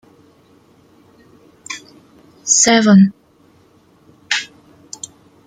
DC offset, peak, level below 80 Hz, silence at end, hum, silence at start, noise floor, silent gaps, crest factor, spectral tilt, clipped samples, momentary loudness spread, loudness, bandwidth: under 0.1%; 0 dBFS; -62 dBFS; 1 s; none; 1.7 s; -52 dBFS; none; 18 dB; -3.5 dB/octave; under 0.1%; 24 LU; -12 LUFS; 9.8 kHz